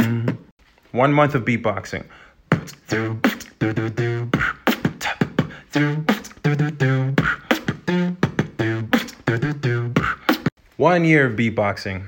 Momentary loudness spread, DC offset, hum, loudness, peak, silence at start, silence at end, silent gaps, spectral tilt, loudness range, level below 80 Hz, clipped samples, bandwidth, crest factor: 8 LU; under 0.1%; none; -21 LUFS; -2 dBFS; 0 s; 0 s; 0.51-0.57 s, 10.52-10.56 s; -6.5 dB/octave; 3 LU; -48 dBFS; under 0.1%; 17 kHz; 20 dB